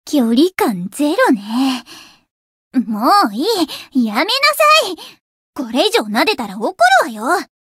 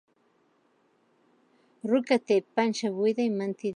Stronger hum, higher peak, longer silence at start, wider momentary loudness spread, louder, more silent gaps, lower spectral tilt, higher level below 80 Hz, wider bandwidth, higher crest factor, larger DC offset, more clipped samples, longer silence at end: neither; first, 0 dBFS vs -10 dBFS; second, 0.05 s vs 1.85 s; first, 10 LU vs 5 LU; first, -15 LUFS vs -27 LUFS; first, 2.31-2.71 s, 5.20-5.53 s vs none; second, -3.5 dB/octave vs -5.5 dB/octave; first, -64 dBFS vs -82 dBFS; first, 16 kHz vs 10.5 kHz; about the same, 16 dB vs 20 dB; neither; neither; first, 0.2 s vs 0.05 s